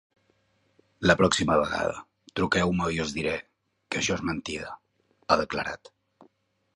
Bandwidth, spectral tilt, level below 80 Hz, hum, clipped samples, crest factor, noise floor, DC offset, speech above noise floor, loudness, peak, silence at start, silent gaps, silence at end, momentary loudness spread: 11.5 kHz; -4.5 dB/octave; -50 dBFS; none; under 0.1%; 24 dB; -69 dBFS; under 0.1%; 43 dB; -27 LUFS; -4 dBFS; 1 s; none; 1 s; 16 LU